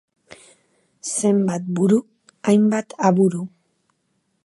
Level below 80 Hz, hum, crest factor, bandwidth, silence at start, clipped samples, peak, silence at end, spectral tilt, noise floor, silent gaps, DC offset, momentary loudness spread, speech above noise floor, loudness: -70 dBFS; none; 20 dB; 11.5 kHz; 0.3 s; under 0.1%; -2 dBFS; 1 s; -6.5 dB/octave; -70 dBFS; none; under 0.1%; 11 LU; 52 dB; -20 LUFS